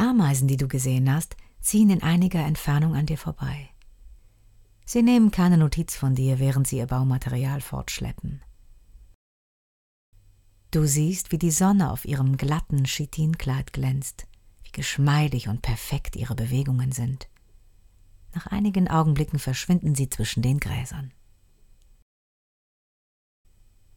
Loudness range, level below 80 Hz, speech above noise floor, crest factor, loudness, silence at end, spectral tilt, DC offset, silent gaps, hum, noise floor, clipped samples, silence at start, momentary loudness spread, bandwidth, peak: 8 LU; -42 dBFS; 33 dB; 16 dB; -24 LUFS; 2.85 s; -6 dB/octave; under 0.1%; 9.15-10.12 s; none; -56 dBFS; under 0.1%; 0 s; 12 LU; 18 kHz; -8 dBFS